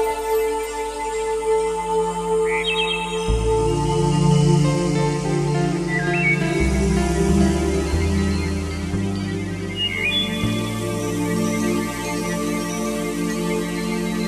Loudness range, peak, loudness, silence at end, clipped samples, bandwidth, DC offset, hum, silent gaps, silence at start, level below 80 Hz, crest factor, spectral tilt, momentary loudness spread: 4 LU; -6 dBFS; -21 LUFS; 0 s; under 0.1%; 14.5 kHz; under 0.1%; none; none; 0 s; -32 dBFS; 16 dB; -5.5 dB/octave; 7 LU